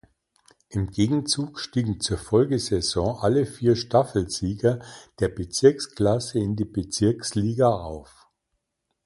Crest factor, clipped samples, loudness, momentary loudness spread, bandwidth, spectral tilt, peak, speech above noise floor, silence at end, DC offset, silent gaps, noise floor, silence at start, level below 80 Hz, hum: 20 dB; under 0.1%; -24 LUFS; 8 LU; 11.5 kHz; -5.5 dB/octave; -4 dBFS; 55 dB; 1.05 s; under 0.1%; none; -78 dBFS; 0.7 s; -46 dBFS; none